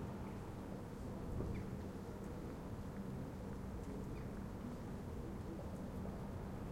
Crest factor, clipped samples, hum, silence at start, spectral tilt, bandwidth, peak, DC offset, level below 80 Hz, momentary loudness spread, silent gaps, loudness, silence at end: 16 dB; under 0.1%; none; 0 s; -7.5 dB/octave; 16.5 kHz; -30 dBFS; under 0.1%; -54 dBFS; 3 LU; none; -48 LUFS; 0 s